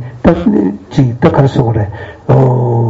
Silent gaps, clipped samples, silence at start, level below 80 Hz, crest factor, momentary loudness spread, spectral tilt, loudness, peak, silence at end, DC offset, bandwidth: none; 0.3%; 0 s; -32 dBFS; 10 dB; 7 LU; -9.5 dB/octave; -11 LUFS; 0 dBFS; 0 s; under 0.1%; 7.6 kHz